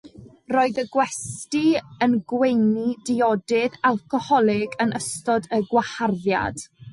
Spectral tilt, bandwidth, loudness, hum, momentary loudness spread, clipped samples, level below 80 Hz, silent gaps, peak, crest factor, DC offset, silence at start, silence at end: -5 dB/octave; 11.5 kHz; -22 LUFS; none; 6 LU; under 0.1%; -56 dBFS; none; -8 dBFS; 16 dB; under 0.1%; 0.05 s; 0 s